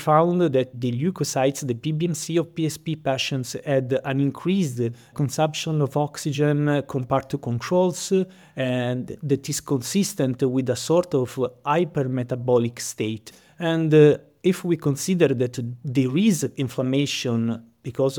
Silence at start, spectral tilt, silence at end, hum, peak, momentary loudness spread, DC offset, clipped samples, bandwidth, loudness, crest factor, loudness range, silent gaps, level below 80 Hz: 0 s; -6 dB/octave; 0 s; none; -4 dBFS; 8 LU; under 0.1%; under 0.1%; 19 kHz; -23 LUFS; 18 dB; 3 LU; none; -62 dBFS